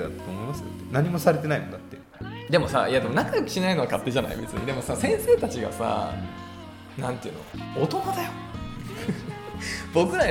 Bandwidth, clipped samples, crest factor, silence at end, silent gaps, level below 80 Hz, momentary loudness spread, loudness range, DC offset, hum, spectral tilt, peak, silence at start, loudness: 18.5 kHz; under 0.1%; 20 dB; 0 s; none; -48 dBFS; 15 LU; 7 LU; under 0.1%; none; -5.5 dB/octave; -6 dBFS; 0 s; -26 LUFS